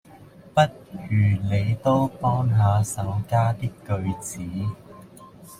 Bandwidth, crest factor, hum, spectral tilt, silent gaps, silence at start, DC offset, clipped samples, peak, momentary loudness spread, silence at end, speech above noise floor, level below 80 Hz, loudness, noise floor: 15 kHz; 18 dB; none; -6.5 dB/octave; none; 0.15 s; under 0.1%; under 0.1%; -6 dBFS; 10 LU; 0.05 s; 25 dB; -50 dBFS; -24 LUFS; -47 dBFS